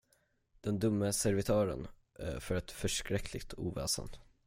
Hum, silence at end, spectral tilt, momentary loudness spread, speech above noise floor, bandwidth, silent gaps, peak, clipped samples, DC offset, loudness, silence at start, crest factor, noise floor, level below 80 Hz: none; 0.25 s; -4.5 dB/octave; 13 LU; 40 dB; 16.5 kHz; none; -18 dBFS; under 0.1%; under 0.1%; -36 LUFS; 0.65 s; 18 dB; -75 dBFS; -52 dBFS